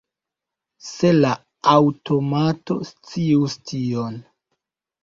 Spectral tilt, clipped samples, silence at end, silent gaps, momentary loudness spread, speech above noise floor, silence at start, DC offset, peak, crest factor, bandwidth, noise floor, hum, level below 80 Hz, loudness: -7 dB/octave; under 0.1%; 0.8 s; none; 15 LU; 66 dB; 0.85 s; under 0.1%; -2 dBFS; 20 dB; 7.6 kHz; -86 dBFS; none; -58 dBFS; -20 LUFS